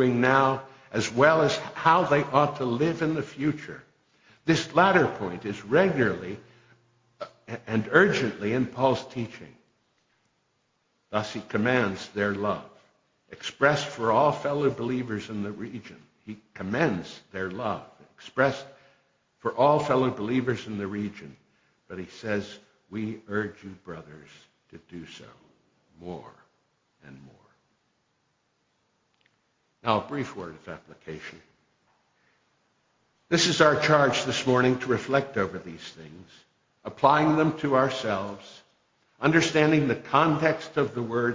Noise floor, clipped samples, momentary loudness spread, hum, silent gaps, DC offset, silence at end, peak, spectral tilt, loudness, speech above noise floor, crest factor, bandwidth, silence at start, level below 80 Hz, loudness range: -73 dBFS; under 0.1%; 22 LU; none; none; under 0.1%; 0 s; -6 dBFS; -5.5 dB/octave; -25 LUFS; 47 dB; 22 dB; 7.6 kHz; 0 s; -62 dBFS; 12 LU